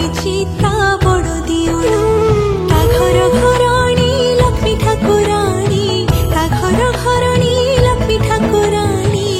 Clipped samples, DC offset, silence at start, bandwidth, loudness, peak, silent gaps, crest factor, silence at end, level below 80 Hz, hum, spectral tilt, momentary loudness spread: under 0.1%; under 0.1%; 0 s; 16 kHz; -13 LUFS; 0 dBFS; none; 12 dB; 0 s; -22 dBFS; none; -5.5 dB/octave; 4 LU